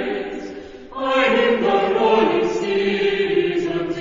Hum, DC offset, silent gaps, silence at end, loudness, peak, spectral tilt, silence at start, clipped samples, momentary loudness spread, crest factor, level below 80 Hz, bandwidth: none; under 0.1%; none; 0 s; -19 LUFS; -4 dBFS; -5.5 dB/octave; 0 s; under 0.1%; 14 LU; 14 dB; -50 dBFS; 7.6 kHz